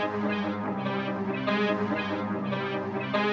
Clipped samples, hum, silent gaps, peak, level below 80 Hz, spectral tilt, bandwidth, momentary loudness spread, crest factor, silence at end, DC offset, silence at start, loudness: under 0.1%; none; none; -14 dBFS; -68 dBFS; -7 dB/octave; 6.8 kHz; 4 LU; 14 dB; 0 s; under 0.1%; 0 s; -29 LUFS